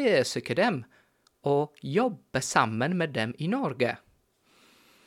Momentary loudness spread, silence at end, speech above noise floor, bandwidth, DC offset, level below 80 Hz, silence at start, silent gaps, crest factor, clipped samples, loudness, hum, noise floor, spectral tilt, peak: 6 LU; 1.1 s; 38 dB; 16.5 kHz; under 0.1%; -68 dBFS; 0 s; none; 22 dB; under 0.1%; -28 LUFS; none; -65 dBFS; -5 dB/octave; -6 dBFS